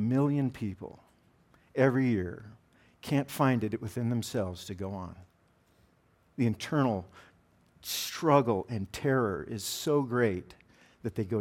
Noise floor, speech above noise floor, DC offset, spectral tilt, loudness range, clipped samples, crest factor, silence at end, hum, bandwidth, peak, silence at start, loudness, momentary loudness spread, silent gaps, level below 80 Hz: -67 dBFS; 37 dB; under 0.1%; -6 dB/octave; 5 LU; under 0.1%; 22 dB; 0 s; none; 17.5 kHz; -10 dBFS; 0 s; -31 LUFS; 16 LU; none; -66 dBFS